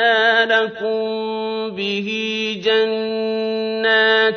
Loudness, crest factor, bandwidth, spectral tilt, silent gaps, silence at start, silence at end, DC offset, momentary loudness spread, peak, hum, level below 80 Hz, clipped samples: -18 LUFS; 16 dB; 6.6 kHz; -4 dB/octave; none; 0 s; 0 s; under 0.1%; 9 LU; -2 dBFS; none; -64 dBFS; under 0.1%